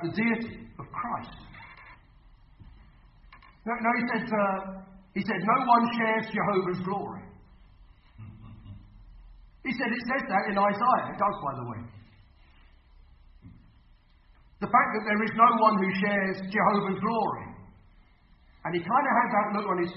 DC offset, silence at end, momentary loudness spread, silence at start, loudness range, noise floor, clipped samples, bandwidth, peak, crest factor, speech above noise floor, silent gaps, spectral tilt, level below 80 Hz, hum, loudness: under 0.1%; 0 s; 22 LU; 0 s; 12 LU; -59 dBFS; under 0.1%; 5.8 kHz; -8 dBFS; 22 dB; 32 dB; none; -10 dB/octave; -58 dBFS; none; -27 LUFS